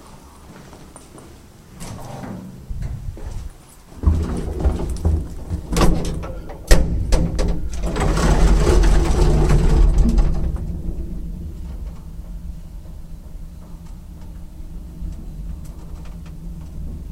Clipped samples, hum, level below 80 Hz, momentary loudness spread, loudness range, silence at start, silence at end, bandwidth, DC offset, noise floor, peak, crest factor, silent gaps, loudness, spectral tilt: under 0.1%; none; -22 dBFS; 22 LU; 18 LU; 0 s; 0 s; 14 kHz; under 0.1%; -42 dBFS; 0 dBFS; 20 dB; none; -22 LUFS; -6 dB/octave